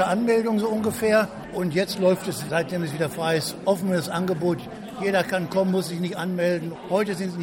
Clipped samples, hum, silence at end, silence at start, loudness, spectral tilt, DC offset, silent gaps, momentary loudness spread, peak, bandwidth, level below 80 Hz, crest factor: under 0.1%; none; 0 s; 0 s; -24 LUFS; -5.5 dB/octave; under 0.1%; none; 7 LU; -8 dBFS; 16.5 kHz; -58 dBFS; 16 dB